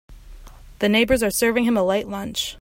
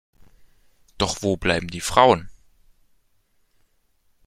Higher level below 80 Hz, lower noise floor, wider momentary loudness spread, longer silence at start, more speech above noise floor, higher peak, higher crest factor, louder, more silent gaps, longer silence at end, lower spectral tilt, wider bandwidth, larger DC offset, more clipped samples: first, -42 dBFS vs -48 dBFS; second, -41 dBFS vs -64 dBFS; about the same, 8 LU vs 9 LU; second, 0.1 s vs 1 s; second, 21 dB vs 45 dB; second, -6 dBFS vs 0 dBFS; second, 16 dB vs 24 dB; about the same, -20 LUFS vs -21 LUFS; neither; second, 0 s vs 1.95 s; about the same, -3.5 dB/octave vs -4 dB/octave; about the same, 16.5 kHz vs 16 kHz; neither; neither